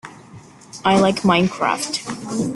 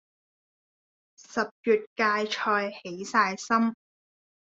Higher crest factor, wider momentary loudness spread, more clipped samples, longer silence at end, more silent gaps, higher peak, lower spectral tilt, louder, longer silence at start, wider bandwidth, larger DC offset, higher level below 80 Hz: about the same, 18 dB vs 20 dB; first, 13 LU vs 8 LU; neither; second, 0 s vs 0.8 s; second, none vs 1.51-1.64 s, 1.87-1.96 s; first, -2 dBFS vs -8 dBFS; about the same, -4.5 dB/octave vs -4 dB/octave; first, -19 LUFS vs -27 LUFS; second, 0.05 s vs 1.3 s; first, 12 kHz vs 7.8 kHz; neither; first, -54 dBFS vs -76 dBFS